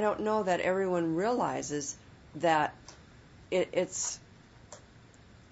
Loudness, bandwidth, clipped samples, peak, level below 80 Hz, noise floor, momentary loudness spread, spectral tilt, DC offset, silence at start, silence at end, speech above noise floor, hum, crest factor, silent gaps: -31 LUFS; 8 kHz; under 0.1%; -14 dBFS; -64 dBFS; -56 dBFS; 23 LU; -4 dB/octave; under 0.1%; 0 s; 0.45 s; 26 dB; none; 18 dB; none